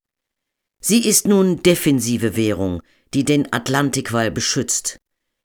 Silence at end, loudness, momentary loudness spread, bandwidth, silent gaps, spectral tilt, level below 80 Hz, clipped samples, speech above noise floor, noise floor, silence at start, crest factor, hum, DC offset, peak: 0.5 s; -18 LUFS; 10 LU; over 20 kHz; none; -4 dB/octave; -50 dBFS; under 0.1%; 64 dB; -81 dBFS; 0.85 s; 18 dB; none; under 0.1%; -2 dBFS